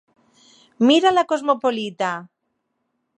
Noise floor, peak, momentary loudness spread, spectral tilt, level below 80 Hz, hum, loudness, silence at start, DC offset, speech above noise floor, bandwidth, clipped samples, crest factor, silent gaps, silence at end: -74 dBFS; -2 dBFS; 10 LU; -4 dB/octave; -72 dBFS; none; -19 LUFS; 0.8 s; under 0.1%; 56 dB; 9.6 kHz; under 0.1%; 18 dB; none; 0.95 s